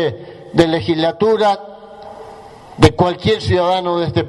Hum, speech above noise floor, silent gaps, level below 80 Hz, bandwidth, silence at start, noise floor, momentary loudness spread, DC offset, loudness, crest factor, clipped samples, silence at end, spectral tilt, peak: none; 22 dB; none; -38 dBFS; 11.5 kHz; 0 s; -37 dBFS; 22 LU; under 0.1%; -15 LUFS; 16 dB; 0.1%; 0 s; -6.5 dB/octave; 0 dBFS